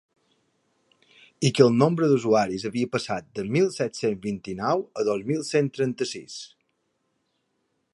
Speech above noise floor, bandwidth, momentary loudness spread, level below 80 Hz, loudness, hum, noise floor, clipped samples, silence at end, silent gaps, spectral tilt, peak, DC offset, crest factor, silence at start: 50 dB; 11.5 kHz; 12 LU; -64 dBFS; -24 LUFS; none; -74 dBFS; under 0.1%; 1.5 s; none; -6 dB/octave; -2 dBFS; under 0.1%; 22 dB; 1.4 s